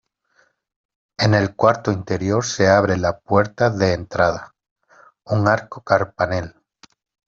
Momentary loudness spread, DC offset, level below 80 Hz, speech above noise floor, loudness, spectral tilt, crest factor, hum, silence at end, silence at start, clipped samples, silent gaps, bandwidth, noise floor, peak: 7 LU; under 0.1%; -52 dBFS; 44 dB; -19 LUFS; -5 dB/octave; 18 dB; none; 0.8 s; 1.2 s; under 0.1%; 4.71-4.76 s; 7.8 kHz; -62 dBFS; -2 dBFS